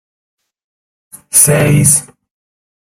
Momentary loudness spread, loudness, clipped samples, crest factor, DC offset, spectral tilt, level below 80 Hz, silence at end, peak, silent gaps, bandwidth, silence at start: 4 LU; -9 LUFS; 0.2%; 14 dB; under 0.1%; -4 dB/octave; -44 dBFS; 0.85 s; 0 dBFS; none; over 20 kHz; 1.35 s